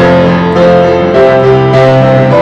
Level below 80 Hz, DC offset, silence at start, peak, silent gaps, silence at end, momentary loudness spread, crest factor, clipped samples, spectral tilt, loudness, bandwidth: -32 dBFS; under 0.1%; 0 s; 0 dBFS; none; 0 s; 1 LU; 6 dB; 0.3%; -8 dB/octave; -6 LUFS; 8 kHz